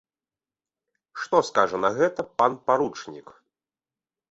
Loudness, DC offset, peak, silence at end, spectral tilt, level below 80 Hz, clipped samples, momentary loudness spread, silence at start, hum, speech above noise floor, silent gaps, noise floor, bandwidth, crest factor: -23 LUFS; under 0.1%; -4 dBFS; 1.1 s; -4.5 dB/octave; -68 dBFS; under 0.1%; 19 LU; 1.15 s; none; over 66 dB; none; under -90 dBFS; 8 kHz; 22 dB